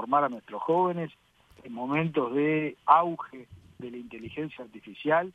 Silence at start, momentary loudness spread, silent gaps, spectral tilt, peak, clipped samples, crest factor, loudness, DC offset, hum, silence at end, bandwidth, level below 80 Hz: 0 s; 21 LU; none; -8.5 dB/octave; -6 dBFS; under 0.1%; 24 dB; -27 LUFS; under 0.1%; none; 0.05 s; 7.4 kHz; -68 dBFS